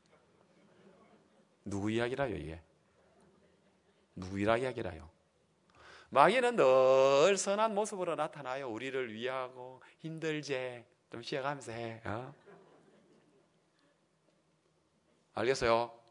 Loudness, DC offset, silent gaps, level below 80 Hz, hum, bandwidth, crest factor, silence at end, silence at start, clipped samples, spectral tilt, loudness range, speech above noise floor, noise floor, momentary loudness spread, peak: -32 LUFS; under 0.1%; none; -68 dBFS; none; 11 kHz; 26 dB; 0.15 s; 1.65 s; under 0.1%; -4.5 dB/octave; 15 LU; 41 dB; -74 dBFS; 22 LU; -10 dBFS